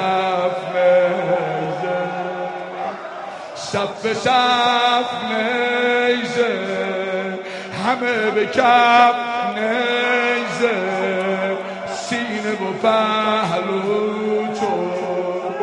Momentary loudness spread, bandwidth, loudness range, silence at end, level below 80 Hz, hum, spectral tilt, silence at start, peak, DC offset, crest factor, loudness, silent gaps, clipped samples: 11 LU; 11 kHz; 4 LU; 0 s; -64 dBFS; none; -4.5 dB/octave; 0 s; 0 dBFS; under 0.1%; 18 dB; -19 LUFS; none; under 0.1%